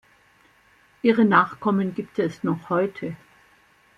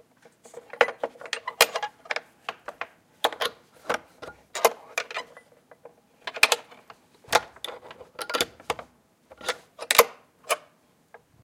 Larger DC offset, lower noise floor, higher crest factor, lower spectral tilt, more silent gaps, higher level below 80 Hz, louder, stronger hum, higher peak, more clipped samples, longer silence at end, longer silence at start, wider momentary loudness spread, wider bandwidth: neither; second, -58 dBFS vs -62 dBFS; second, 22 dB vs 30 dB; first, -8 dB/octave vs 0 dB/octave; neither; about the same, -66 dBFS vs -66 dBFS; first, -22 LUFS vs -26 LUFS; neither; second, -4 dBFS vs 0 dBFS; neither; about the same, 0.8 s vs 0.85 s; first, 1.05 s vs 0.55 s; second, 14 LU vs 21 LU; second, 7.2 kHz vs 16.5 kHz